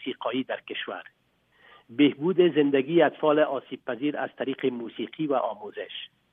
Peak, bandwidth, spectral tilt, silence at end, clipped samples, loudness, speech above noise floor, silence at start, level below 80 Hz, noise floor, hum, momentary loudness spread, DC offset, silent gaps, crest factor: -8 dBFS; 3.8 kHz; -9 dB/octave; 0.25 s; under 0.1%; -26 LUFS; 35 dB; 0 s; -80 dBFS; -61 dBFS; none; 15 LU; under 0.1%; none; 18 dB